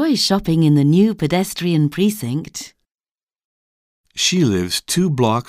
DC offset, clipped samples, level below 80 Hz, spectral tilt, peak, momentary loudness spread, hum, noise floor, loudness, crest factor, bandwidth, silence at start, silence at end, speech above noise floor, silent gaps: under 0.1%; under 0.1%; -48 dBFS; -5 dB/octave; -4 dBFS; 12 LU; none; under -90 dBFS; -17 LUFS; 14 dB; 16 kHz; 0 s; 0.05 s; over 73 dB; 3.11-3.15 s, 3.23-3.27 s, 3.44-4.04 s